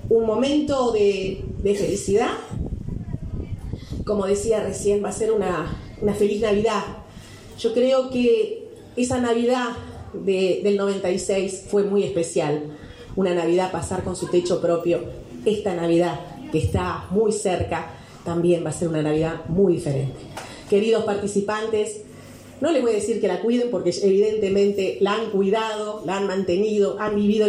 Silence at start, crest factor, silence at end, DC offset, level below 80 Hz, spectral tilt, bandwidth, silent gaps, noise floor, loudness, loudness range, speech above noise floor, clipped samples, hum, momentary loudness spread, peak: 0 s; 14 dB; 0 s; under 0.1%; -44 dBFS; -5.5 dB/octave; 12.5 kHz; none; -42 dBFS; -22 LUFS; 3 LU; 21 dB; under 0.1%; none; 12 LU; -8 dBFS